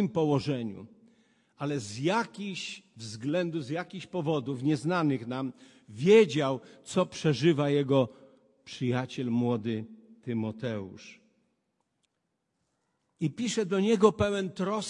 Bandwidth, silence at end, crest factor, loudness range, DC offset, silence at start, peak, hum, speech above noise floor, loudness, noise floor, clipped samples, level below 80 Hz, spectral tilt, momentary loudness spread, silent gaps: 11 kHz; 0 s; 22 dB; 11 LU; under 0.1%; 0 s; -8 dBFS; none; 52 dB; -29 LUFS; -81 dBFS; under 0.1%; -66 dBFS; -6 dB/octave; 15 LU; none